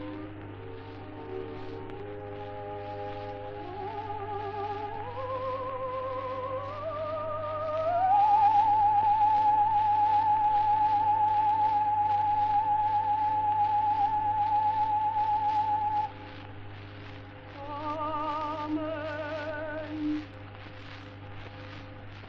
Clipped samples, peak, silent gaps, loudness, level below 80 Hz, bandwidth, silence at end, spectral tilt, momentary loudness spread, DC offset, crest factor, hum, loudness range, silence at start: under 0.1%; -16 dBFS; none; -28 LUFS; -56 dBFS; 6 kHz; 0 s; -7.5 dB/octave; 20 LU; under 0.1%; 14 dB; 50 Hz at -50 dBFS; 13 LU; 0 s